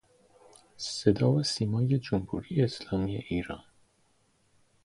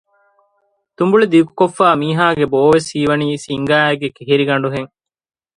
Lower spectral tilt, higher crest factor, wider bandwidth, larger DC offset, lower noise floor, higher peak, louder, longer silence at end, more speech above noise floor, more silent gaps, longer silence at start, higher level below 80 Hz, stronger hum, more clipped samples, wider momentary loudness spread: about the same, -6.5 dB/octave vs -6 dB/octave; first, 22 dB vs 16 dB; about the same, 11.5 kHz vs 11.5 kHz; neither; first, -69 dBFS vs -65 dBFS; second, -8 dBFS vs 0 dBFS; second, -29 LUFS vs -14 LUFS; first, 1.25 s vs 0.7 s; second, 40 dB vs 51 dB; neither; second, 0.8 s vs 1 s; about the same, -54 dBFS vs -54 dBFS; neither; neither; about the same, 10 LU vs 9 LU